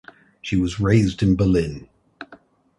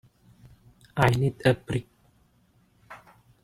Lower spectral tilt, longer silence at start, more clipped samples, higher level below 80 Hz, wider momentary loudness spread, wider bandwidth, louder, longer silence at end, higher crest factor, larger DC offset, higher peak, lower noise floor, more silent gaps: about the same, -7.5 dB/octave vs -6.5 dB/octave; second, 0.45 s vs 0.95 s; neither; first, -38 dBFS vs -54 dBFS; about the same, 23 LU vs 25 LU; second, 11.5 kHz vs 15 kHz; first, -20 LUFS vs -26 LUFS; about the same, 0.45 s vs 0.5 s; second, 18 dB vs 26 dB; neither; about the same, -4 dBFS vs -4 dBFS; second, -50 dBFS vs -64 dBFS; neither